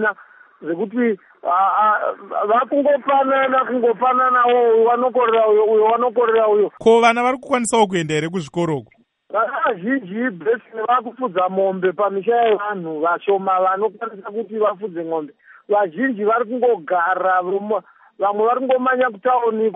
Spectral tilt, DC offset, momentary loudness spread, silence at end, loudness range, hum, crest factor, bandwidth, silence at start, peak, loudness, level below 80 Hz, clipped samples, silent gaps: -5 dB/octave; under 0.1%; 10 LU; 0 s; 6 LU; none; 16 dB; 10.5 kHz; 0 s; -2 dBFS; -18 LUFS; -68 dBFS; under 0.1%; none